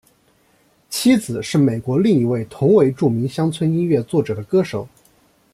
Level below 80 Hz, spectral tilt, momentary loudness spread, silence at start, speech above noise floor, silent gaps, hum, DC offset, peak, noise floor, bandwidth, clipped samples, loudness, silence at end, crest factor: -56 dBFS; -6.5 dB/octave; 7 LU; 0.9 s; 41 dB; none; none; under 0.1%; -4 dBFS; -58 dBFS; 15 kHz; under 0.1%; -18 LUFS; 0.65 s; 16 dB